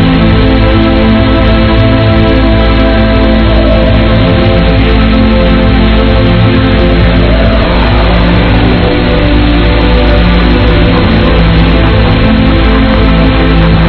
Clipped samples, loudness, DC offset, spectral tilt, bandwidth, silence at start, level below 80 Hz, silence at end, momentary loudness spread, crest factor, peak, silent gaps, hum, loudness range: 5%; -7 LUFS; under 0.1%; -9.5 dB/octave; 5.4 kHz; 0 s; -10 dBFS; 0 s; 1 LU; 6 dB; 0 dBFS; none; none; 1 LU